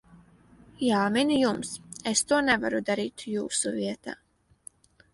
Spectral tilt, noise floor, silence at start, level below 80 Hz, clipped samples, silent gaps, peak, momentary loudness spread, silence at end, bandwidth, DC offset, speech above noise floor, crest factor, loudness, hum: -3 dB/octave; -56 dBFS; 0.15 s; -62 dBFS; under 0.1%; none; -8 dBFS; 12 LU; 1 s; 11.5 kHz; under 0.1%; 29 dB; 20 dB; -27 LUFS; none